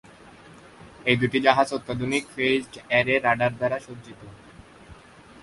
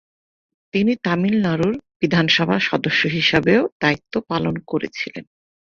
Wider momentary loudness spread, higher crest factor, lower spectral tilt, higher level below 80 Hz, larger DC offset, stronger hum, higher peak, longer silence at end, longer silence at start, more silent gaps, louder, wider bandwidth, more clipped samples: first, 18 LU vs 9 LU; first, 24 dB vs 18 dB; about the same, -5 dB/octave vs -6 dB/octave; about the same, -56 dBFS vs -52 dBFS; neither; neither; about the same, -2 dBFS vs -2 dBFS; about the same, 0.5 s vs 0.55 s; about the same, 0.8 s vs 0.75 s; second, none vs 1.96-2.00 s, 3.72-3.80 s; second, -23 LUFS vs -19 LUFS; first, 11.5 kHz vs 7.2 kHz; neither